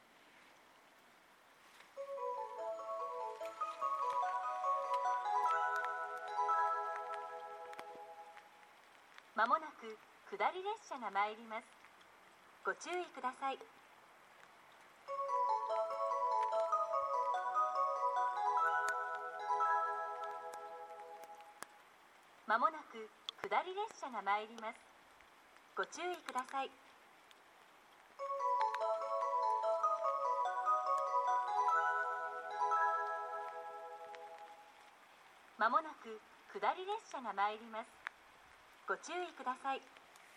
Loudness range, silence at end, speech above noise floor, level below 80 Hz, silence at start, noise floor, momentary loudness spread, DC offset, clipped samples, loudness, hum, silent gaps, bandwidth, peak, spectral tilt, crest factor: 8 LU; 0 s; 25 dB; under -90 dBFS; 0.35 s; -66 dBFS; 18 LU; under 0.1%; under 0.1%; -39 LUFS; none; none; 15 kHz; -20 dBFS; -2 dB/octave; 20 dB